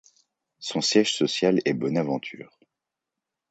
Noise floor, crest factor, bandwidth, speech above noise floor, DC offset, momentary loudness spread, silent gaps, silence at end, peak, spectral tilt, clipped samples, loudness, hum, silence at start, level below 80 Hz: -86 dBFS; 22 dB; 9 kHz; 62 dB; under 0.1%; 16 LU; none; 1.05 s; -6 dBFS; -4 dB/octave; under 0.1%; -24 LUFS; none; 0.6 s; -70 dBFS